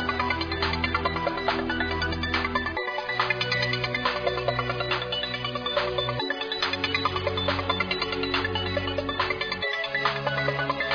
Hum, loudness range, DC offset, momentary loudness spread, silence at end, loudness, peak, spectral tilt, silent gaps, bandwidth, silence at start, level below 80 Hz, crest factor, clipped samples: none; 1 LU; under 0.1%; 3 LU; 0 s; -26 LUFS; -10 dBFS; -5.5 dB/octave; none; 5.4 kHz; 0 s; -44 dBFS; 18 dB; under 0.1%